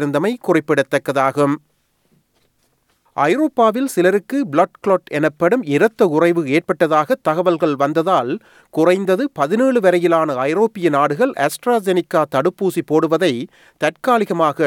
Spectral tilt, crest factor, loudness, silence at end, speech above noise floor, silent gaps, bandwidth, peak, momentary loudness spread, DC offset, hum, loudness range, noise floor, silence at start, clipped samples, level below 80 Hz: -6 dB/octave; 16 dB; -17 LUFS; 0 s; 46 dB; none; 17.5 kHz; -2 dBFS; 5 LU; under 0.1%; none; 3 LU; -63 dBFS; 0 s; under 0.1%; -70 dBFS